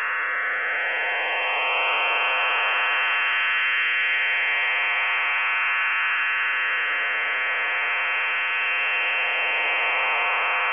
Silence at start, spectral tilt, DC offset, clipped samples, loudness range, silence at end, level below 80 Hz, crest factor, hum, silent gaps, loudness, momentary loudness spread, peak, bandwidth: 0 s; 5.5 dB/octave; 0.2%; under 0.1%; 1 LU; 0 s; -76 dBFS; 10 dB; none; none; -21 LUFS; 3 LU; -12 dBFS; 3.6 kHz